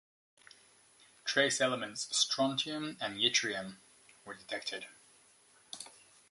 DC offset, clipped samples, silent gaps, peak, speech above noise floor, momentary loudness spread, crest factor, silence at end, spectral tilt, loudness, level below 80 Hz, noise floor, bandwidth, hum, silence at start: under 0.1%; under 0.1%; none; -14 dBFS; 30 dB; 20 LU; 22 dB; 0.4 s; -1.5 dB/octave; -33 LUFS; -80 dBFS; -65 dBFS; 11.5 kHz; none; 1.25 s